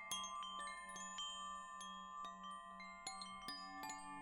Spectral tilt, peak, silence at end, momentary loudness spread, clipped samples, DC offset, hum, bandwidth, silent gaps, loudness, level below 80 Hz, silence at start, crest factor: -0.5 dB/octave; -30 dBFS; 0 s; 5 LU; under 0.1%; under 0.1%; none; 16.5 kHz; none; -49 LUFS; -76 dBFS; 0 s; 20 dB